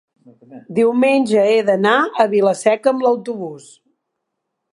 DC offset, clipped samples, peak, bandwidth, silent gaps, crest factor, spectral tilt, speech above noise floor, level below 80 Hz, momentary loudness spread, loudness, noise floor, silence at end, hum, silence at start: under 0.1%; under 0.1%; 0 dBFS; 11.5 kHz; none; 16 dB; -5 dB/octave; 60 dB; -72 dBFS; 10 LU; -16 LUFS; -76 dBFS; 1.15 s; none; 0.5 s